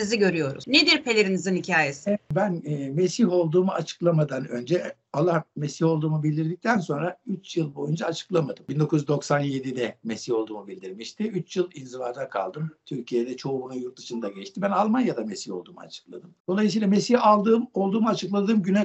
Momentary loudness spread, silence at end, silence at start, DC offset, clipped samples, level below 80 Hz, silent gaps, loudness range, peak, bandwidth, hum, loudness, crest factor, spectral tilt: 14 LU; 0 s; 0 s; under 0.1%; under 0.1%; -70 dBFS; 16.40-16.45 s; 8 LU; -6 dBFS; 8.4 kHz; none; -25 LUFS; 20 dB; -5.5 dB/octave